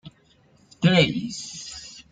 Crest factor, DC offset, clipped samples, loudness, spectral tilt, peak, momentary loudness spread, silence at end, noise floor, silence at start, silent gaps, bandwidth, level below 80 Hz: 20 dB; under 0.1%; under 0.1%; -22 LUFS; -5 dB/octave; -6 dBFS; 18 LU; 0.1 s; -59 dBFS; 0.05 s; none; 9.2 kHz; -54 dBFS